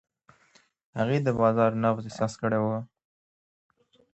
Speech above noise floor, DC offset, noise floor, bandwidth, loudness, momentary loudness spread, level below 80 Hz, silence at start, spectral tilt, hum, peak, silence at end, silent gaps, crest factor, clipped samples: 38 dB; under 0.1%; -63 dBFS; 8.2 kHz; -26 LUFS; 12 LU; -62 dBFS; 0.95 s; -7.5 dB/octave; none; -10 dBFS; 1.3 s; none; 20 dB; under 0.1%